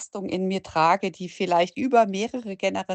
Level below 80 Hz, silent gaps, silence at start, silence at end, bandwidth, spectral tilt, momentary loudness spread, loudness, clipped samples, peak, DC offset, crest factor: -64 dBFS; none; 0 s; 0 s; 8.8 kHz; -5 dB/octave; 9 LU; -24 LUFS; under 0.1%; -6 dBFS; under 0.1%; 18 dB